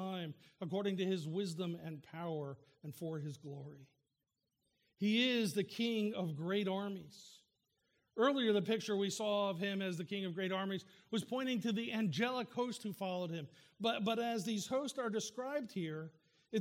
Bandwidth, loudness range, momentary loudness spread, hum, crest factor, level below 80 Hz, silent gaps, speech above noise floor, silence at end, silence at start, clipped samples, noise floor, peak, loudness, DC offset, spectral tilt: 16.5 kHz; 5 LU; 14 LU; none; 18 dB; -86 dBFS; none; 50 dB; 0 s; 0 s; under 0.1%; -88 dBFS; -22 dBFS; -39 LUFS; under 0.1%; -5 dB/octave